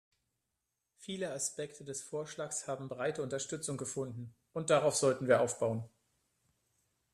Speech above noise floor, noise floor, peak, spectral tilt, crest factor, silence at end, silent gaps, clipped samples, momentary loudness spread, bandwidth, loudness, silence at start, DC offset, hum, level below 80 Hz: 51 dB; -86 dBFS; -14 dBFS; -4 dB/octave; 22 dB; 1.25 s; none; under 0.1%; 14 LU; 13.5 kHz; -35 LUFS; 1 s; under 0.1%; none; -76 dBFS